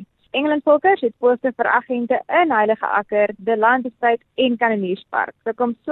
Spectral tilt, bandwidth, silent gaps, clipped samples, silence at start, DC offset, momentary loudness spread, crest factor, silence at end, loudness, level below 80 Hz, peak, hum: -8.5 dB/octave; 4.2 kHz; none; under 0.1%; 0 s; under 0.1%; 7 LU; 16 dB; 0 s; -19 LUFS; -64 dBFS; -2 dBFS; none